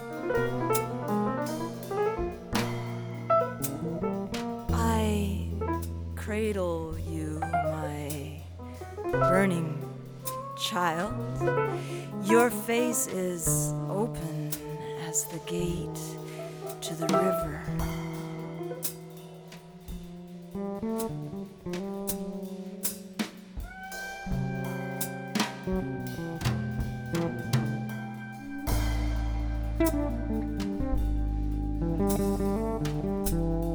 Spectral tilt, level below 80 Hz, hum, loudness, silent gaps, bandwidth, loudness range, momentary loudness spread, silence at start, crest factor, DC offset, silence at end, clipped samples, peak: -5.5 dB/octave; -40 dBFS; none; -31 LUFS; none; over 20 kHz; 7 LU; 12 LU; 0 s; 20 dB; under 0.1%; 0 s; under 0.1%; -10 dBFS